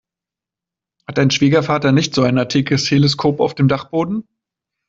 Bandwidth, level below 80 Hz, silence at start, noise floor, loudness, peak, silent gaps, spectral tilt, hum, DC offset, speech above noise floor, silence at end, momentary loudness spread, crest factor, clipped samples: 7.8 kHz; -52 dBFS; 1.1 s; -87 dBFS; -16 LUFS; -2 dBFS; none; -5.5 dB/octave; none; under 0.1%; 72 dB; 0.7 s; 6 LU; 14 dB; under 0.1%